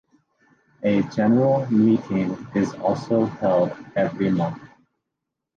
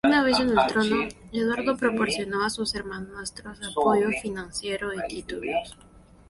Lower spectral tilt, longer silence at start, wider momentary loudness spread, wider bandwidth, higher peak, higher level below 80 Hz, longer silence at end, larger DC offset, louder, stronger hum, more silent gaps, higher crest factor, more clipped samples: first, -8.5 dB/octave vs -4 dB/octave; first, 0.8 s vs 0.05 s; second, 7 LU vs 14 LU; second, 7.2 kHz vs 11.5 kHz; about the same, -8 dBFS vs -8 dBFS; second, -58 dBFS vs -52 dBFS; first, 0.9 s vs 0.3 s; neither; first, -22 LUFS vs -26 LUFS; neither; neither; about the same, 14 dB vs 18 dB; neither